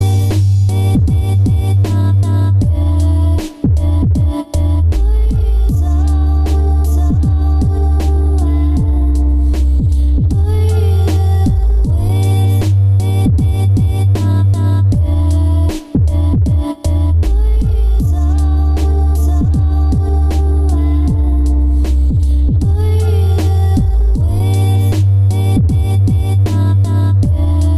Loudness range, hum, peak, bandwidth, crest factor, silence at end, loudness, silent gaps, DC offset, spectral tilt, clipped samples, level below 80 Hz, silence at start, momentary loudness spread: 1 LU; none; -2 dBFS; 12.5 kHz; 8 dB; 0 s; -13 LUFS; none; under 0.1%; -8 dB/octave; under 0.1%; -14 dBFS; 0 s; 2 LU